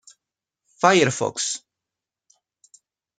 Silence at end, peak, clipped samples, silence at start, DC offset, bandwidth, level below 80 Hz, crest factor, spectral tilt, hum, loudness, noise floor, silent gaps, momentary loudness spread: 1.6 s; -2 dBFS; under 0.1%; 0.8 s; under 0.1%; 9.6 kHz; -68 dBFS; 24 dB; -3.5 dB/octave; none; -21 LUFS; -87 dBFS; none; 10 LU